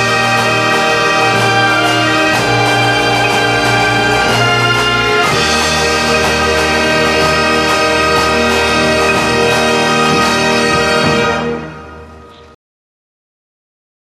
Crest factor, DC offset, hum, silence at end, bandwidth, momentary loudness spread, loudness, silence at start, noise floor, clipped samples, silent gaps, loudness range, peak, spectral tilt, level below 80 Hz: 12 dB; under 0.1%; none; 1.65 s; 15 kHz; 1 LU; -11 LUFS; 0 s; -36 dBFS; under 0.1%; none; 3 LU; 0 dBFS; -3.5 dB/octave; -34 dBFS